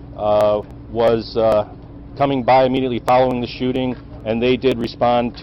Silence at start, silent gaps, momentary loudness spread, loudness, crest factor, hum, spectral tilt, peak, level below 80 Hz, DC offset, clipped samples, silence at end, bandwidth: 0 s; none; 11 LU; -18 LUFS; 12 dB; none; -7.5 dB/octave; -6 dBFS; -40 dBFS; under 0.1%; under 0.1%; 0 s; 14 kHz